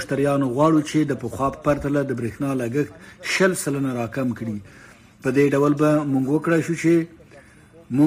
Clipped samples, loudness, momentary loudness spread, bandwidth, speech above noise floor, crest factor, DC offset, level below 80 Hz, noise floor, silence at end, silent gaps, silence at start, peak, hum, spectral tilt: under 0.1%; -21 LUFS; 9 LU; 15.5 kHz; 28 dB; 14 dB; under 0.1%; -50 dBFS; -49 dBFS; 0 s; none; 0 s; -6 dBFS; none; -6 dB/octave